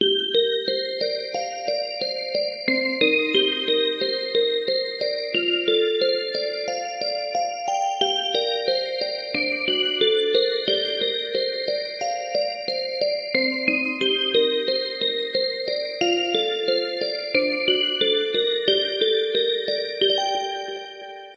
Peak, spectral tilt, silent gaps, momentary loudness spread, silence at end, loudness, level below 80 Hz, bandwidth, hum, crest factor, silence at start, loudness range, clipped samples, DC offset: -6 dBFS; -2.5 dB/octave; none; 7 LU; 0 s; -22 LUFS; -74 dBFS; 8.8 kHz; none; 18 dB; 0 s; 2 LU; under 0.1%; under 0.1%